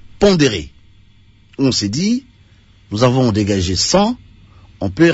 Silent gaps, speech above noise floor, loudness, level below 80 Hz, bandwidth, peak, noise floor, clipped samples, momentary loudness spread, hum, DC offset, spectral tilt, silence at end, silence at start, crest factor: none; 34 dB; -16 LUFS; -40 dBFS; 8 kHz; 0 dBFS; -48 dBFS; under 0.1%; 13 LU; none; under 0.1%; -5 dB/octave; 0 s; 0.05 s; 16 dB